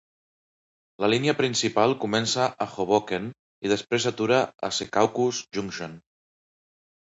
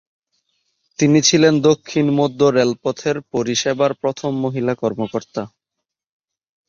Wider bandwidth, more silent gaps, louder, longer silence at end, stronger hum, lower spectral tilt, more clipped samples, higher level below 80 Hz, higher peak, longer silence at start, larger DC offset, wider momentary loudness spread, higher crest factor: about the same, 8.2 kHz vs 7.8 kHz; first, 3.39-3.62 s vs none; second, -25 LUFS vs -17 LUFS; second, 1.05 s vs 1.2 s; neither; about the same, -4 dB/octave vs -4.5 dB/octave; neither; second, -64 dBFS vs -58 dBFS; second, -6 dBFS vs -2 dBFS; about the same, 1 s vs 1 s; neither; second, 9 LU vs 12 LU; about the same, 20 dB vs 18 dB